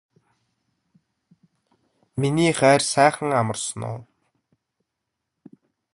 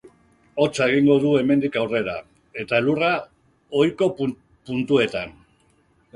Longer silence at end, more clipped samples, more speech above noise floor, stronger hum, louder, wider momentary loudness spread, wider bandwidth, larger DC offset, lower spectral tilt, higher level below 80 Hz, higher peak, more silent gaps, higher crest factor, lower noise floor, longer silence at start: first, 1.9 s vs 0.85 s; neither; first, 61 dB vs 41 dB; neither; about the same, -20 LUFS vs -21 LUFS; about the same, 17 LU vs 16 LU; about the same, 11.5 kHz vs 11.5 kHz; neither; second, -4.5 dB/octave vs -6 dB/octave; about the same, -60 dBFS vs -58 dBFS; first, -2 dBFS vs -6 dBFS; neither; first, 24 dB vs 18 dB; first, -81 dBFS vs -61 dBFS; first, 2.15 s vs 0.05 s